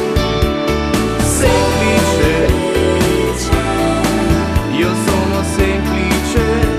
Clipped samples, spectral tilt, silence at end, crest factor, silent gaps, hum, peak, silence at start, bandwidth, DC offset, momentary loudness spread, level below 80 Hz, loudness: under 0.1%; -5 dB/octave; 0 s; 14 dB; none; none; 0 dBFS; 0 s; 14 kHz; under 0.1%; 3 LU; -22 dBFS; -14 LUFS